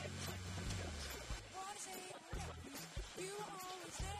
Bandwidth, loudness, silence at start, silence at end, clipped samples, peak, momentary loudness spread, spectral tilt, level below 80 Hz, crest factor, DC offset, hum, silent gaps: 15.5 kHz; -48 LUFS; 0 s; 0 s; under 0.1%; -32 dBFS; 4 LU; -3.5 dB/octave; -54 dBFS; 16 dB; under 0.1%; none; none